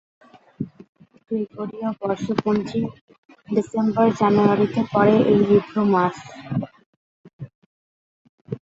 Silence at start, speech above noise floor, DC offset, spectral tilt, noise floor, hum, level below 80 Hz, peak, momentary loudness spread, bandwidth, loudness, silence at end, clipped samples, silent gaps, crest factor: 0.6 s; over 70 dB; under 0.1%; -8 dB/octave; under -90 dBFS; none; -58 dBFS; -2 dBFS; 19 LU; 7.8 kHz; -21 LUFS; 0.1 s; under 0.1%; 0.89-0.93 s, 3.01-3.08 s, 3.18-3.29 s, 6.86-7.24 s, 7.33-7.39 s, 7.55-8.45 s; 20 dB